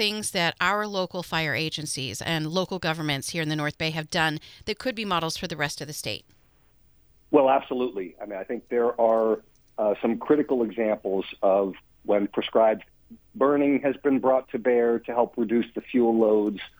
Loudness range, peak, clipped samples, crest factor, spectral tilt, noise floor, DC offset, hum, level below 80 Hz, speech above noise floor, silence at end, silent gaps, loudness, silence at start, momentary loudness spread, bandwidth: 4 LU; -6 dBFS; under 0.1%; 20 dB; -4.5 dB/octave; -59 dBFS; under 0.1%; none; -60 dBFS; 34 dB; 0.1 s; none; -25 LUFS; 0 s; 10 LU; over 20 kHz